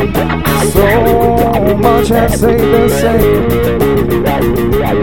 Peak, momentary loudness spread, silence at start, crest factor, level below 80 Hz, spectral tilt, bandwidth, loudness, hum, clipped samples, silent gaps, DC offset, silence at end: 0 dBFS; 3 LU; 0 s; 10 dB; -22 dBFS; -6 dB/octave; 18 kHz; -10 LUFS; none; under 0.1%; none; 4%; 0 s